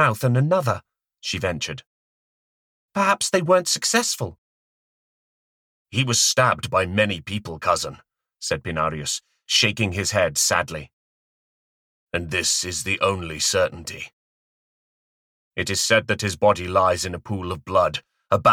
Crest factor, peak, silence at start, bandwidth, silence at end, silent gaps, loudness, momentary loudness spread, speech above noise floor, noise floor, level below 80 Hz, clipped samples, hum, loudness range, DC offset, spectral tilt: 20 dB; -4 dBFS; 0 s; 18.5 kHz; 0 s; 1.86-2.89 s, 4.38-5.85 s, 10.93-12.07 s, 14.13-15.51 s; -21 LUFS; 12 LU; over 68 dB; under -90 dBFS; -52 dBFS; under 0.1%; none; 2 LU; under 0.1%; -3 dB/octave